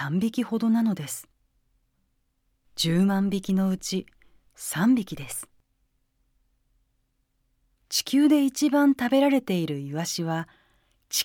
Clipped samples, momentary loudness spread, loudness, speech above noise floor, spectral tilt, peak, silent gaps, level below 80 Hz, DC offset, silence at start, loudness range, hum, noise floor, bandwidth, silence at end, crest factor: under 0.1%; 13 LU; -25 LUFS; 48 dB; -5 dB/octave; -10 dBFS; none; -62 dBFS; under 0.1%; 0 s; 7 LU; none; -72 dBFS; 18 kHz; 0 s; 16 dB